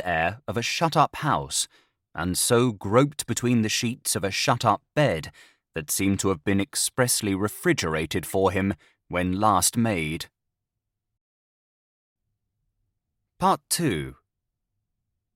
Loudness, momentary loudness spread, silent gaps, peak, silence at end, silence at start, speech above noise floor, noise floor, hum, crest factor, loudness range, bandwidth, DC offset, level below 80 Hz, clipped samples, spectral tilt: -24 LUFS; 10 LU; 11.21-12.16 s; -6 dBFS; 1.25 s; 0 s; 59 dB; -84 dBFS; none; 20 dB; 6 LU; 17 kHz; under 0.1%; -54 dBFS; under 0.1%; -4 dB/octave